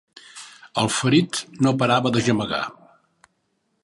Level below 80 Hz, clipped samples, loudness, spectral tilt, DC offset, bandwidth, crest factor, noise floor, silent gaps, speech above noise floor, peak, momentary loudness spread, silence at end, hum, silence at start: -58 dBFS; under 0.1%; -21 LUFS; -5 dB/octave; under 0.1%; 11.5 kHz; 20 dB; -71 dBFS; none; 51 dB; -4 dBFS; 21 LU; 1.1 s; none; 0.35 s